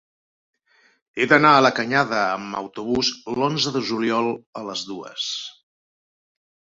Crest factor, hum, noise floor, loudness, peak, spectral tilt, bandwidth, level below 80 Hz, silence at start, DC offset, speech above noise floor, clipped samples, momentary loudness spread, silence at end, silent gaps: 22 dB; none; under -90 dBFS; -21 LUFS; -2 dBFS; -4 dB/octave; 7.8 kHz; -60 dBFS; 1.15 s; under 0.1%; over 69 dB; under 0.1%; 16 LU; 1.15 s; 4.46-4.53 s